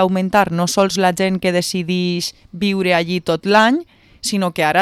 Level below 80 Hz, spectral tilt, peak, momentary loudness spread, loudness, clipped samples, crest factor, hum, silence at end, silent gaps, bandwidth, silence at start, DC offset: -52 dBFS; -4.5 dB/octave; -2 dBFS; 9 LU; -17 LUFS; under 0.1%; 14 dB; none; 0 s; none; 15.5 kHz; 0 s; under 0.1%